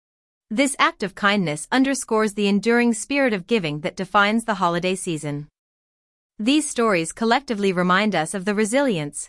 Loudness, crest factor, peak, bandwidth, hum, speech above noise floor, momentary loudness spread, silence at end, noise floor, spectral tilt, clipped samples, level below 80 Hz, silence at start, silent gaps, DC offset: -21 LUFS; 18 dB; -4 dBFS; 12 kHz; none; over 69 dB; 7 LU; 0 s; under -90 dBFS; -4 dB/octave; under 0.1%; -58 dBFS; 0.5 s; 5.59-6.30 s; under 0.1%